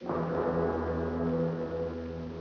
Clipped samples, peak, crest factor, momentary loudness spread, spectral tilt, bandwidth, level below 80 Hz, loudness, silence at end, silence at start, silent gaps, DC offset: under 0.1%; -18 dBFS; 14 dB; 6 LU; -8 dB/octave; 6.4 kHz; -48 dBFS; -32 LUFS; 0 s; 0 s; none; under 0.1%